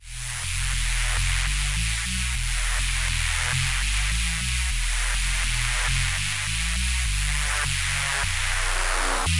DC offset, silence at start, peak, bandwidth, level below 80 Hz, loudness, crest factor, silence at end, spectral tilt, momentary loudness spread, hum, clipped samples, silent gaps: 0.7%; 0 s; -8 dBFS; 11.5 kHz; -28 dBFS; -24 LUFS; 16 dB; 0 s; -1.5 dB/octave; 2 LU; none; under 0.1%; none